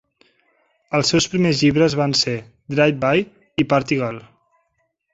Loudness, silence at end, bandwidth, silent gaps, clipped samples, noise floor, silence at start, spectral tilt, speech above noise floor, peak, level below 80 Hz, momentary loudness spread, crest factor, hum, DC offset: -19 LUFS; 0.95 s; 8 kHz; none; under 0.1%; -70 dBFS; 0.9 s; -5 dB/octave; 52 dB; -2 dBFS; -52 dBFS; 10 LU; 18 dB; none; under 0.1%